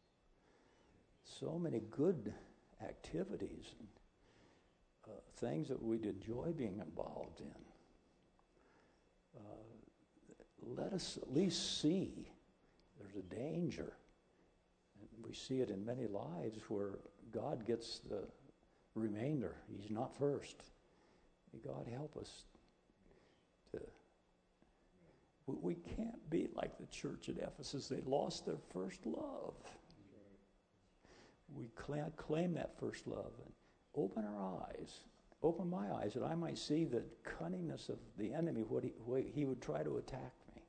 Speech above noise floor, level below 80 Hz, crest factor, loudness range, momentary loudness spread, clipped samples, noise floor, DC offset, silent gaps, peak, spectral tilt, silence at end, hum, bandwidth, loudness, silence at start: 33 dB; -68 dBFS; 22 dB; 10 LU; 18 LU; under 0.1%; -76 dBFS; under 0.1%; none; -24 dBFS; -6 dB/octave; 0.05 s; none; 9 kHz; -44 LUFS; 1.25 s